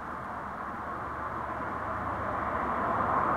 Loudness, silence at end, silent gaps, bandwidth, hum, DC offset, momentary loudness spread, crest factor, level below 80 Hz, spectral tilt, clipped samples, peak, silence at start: -33 LUFS; 0 s; none; 15.5 kHz; none; under 0.1%; 9 LU; 16 dB; -50 dBFS; -7.5 dB/octave; under 0.1%; -16 dBFS; 0 s